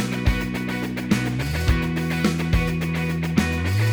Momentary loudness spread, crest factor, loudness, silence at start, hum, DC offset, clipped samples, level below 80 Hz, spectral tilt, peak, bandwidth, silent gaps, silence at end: 4 LU; 18 dB; -23 LUFS; 0 s; none; under 0.1%; under 0.1%; -30 dBFS; -6 dB/octave; -4 dBFS; over 20 kHz; none; 0 s